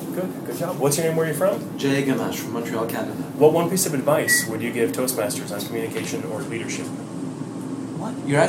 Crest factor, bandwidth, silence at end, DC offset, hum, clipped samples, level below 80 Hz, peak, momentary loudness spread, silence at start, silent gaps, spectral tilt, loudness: 20 dB; 17 kHz; 0 s; under 0.1%; none; under 0.1%; -64 dBFS; -4 dBFS; 12 LU; 0 s; none; -4.5 dB/octave; -23 LUFS